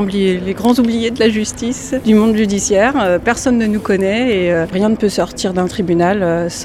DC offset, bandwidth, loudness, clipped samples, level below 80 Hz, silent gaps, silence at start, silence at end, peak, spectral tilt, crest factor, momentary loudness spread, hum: under 0.1%; 15 kHz; -14 LUFS; under 0.1%; -38 dBFS; none; 0 s; 0 s; 0 dBFS; -5 dB/octave; 14 dB; 5 LU; none